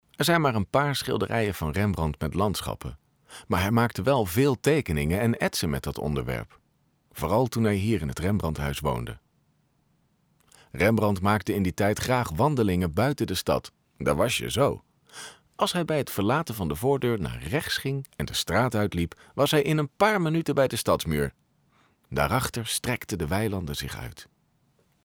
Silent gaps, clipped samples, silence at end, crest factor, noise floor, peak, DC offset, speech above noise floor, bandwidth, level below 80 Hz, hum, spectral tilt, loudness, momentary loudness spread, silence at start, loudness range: none; under 0.1%; 0.8 s; 18 dB; -68 dBFS; -8 dBFS; under 0.1%; 43 dB; over 20 kHz; -44 dBFS; none; -5.5 dB/octave; -26 LUFS; 10 LU; 0.2 s; 3 LU